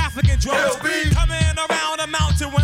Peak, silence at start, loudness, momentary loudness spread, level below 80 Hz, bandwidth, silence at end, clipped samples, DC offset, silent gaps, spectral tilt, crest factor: -6 dBFS; 0 s; -19 LUFS; 2 LU; -24 dBFS; 16 kHz; 0 s; under 0.1%; under 0.1%; none; -4.5 dB/octave; 12 dB